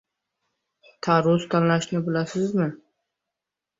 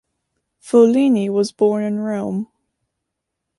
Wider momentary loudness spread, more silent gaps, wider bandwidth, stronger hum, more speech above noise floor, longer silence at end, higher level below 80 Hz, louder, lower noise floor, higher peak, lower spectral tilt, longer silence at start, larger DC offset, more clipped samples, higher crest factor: second, 7 LU vs 12 LU; neither; second, 7.8 kHz vs 11.5 kHz; neither; about the same, 64 dB vs 63 dB; about the same, 1.05 s vs 1.15 s; about the same, -64 dBFS vs -66 dBFS; second, -23 LUFS vs -17 LUFS; first, -86 dBFS vs -79 dBFS; second, -8 dBFS vs -2 dBFS; about the same, -6.5 dB/octave vs -7 dB/octave; first, 1.05 s vs 0.65 s; neither; neither; about the same, 18 dB vs 16 dB